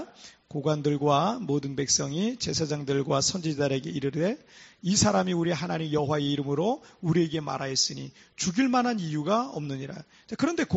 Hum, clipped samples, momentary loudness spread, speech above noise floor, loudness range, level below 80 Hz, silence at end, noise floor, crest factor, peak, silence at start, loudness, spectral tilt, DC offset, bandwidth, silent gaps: none; under 0.1%; 11 LU; 23 dB; 2 LU; -58 dBFS; 0 s; -50 dBFS; 18 dB; -10 dBFS; 0 s; -27 LUFS; -5 dB/octave; under 0.1%; 8 kHz; none